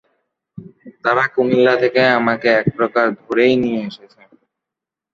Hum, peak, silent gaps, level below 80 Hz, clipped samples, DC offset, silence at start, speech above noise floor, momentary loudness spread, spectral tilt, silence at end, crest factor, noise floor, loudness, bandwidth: none; -2 dBFS; none; -58 dBFS; under 0.1%; under 0.1%; 0.55 s; 69 dB; 7 LU; -7 dB/octave; 1.15 s; 16 dB; -85 dBFS; -16 LUFS; 7.2 kHz